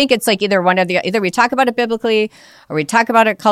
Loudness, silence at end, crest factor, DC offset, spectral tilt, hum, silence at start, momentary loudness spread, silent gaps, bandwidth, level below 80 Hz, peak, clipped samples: -15 LUFS; 0 s; 14 dB; under 0.1%; -4 dB/octave; none; 0 s; 5 LU; none; 16 kHz; -58 dBFS; 0 dBFS; under 0.1%